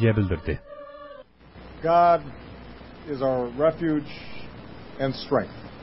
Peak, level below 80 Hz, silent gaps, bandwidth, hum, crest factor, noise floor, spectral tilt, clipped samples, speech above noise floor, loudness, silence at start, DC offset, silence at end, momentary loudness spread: -8 dBFS; -44 dBFS; none; 5.8 kHz; none; 18 dB; -47 dBFS; -11.5 dB/octave; under 0.1%; 23 dB; -24 LUFS; 0 s; under 0.1%; 0 s; 23 LU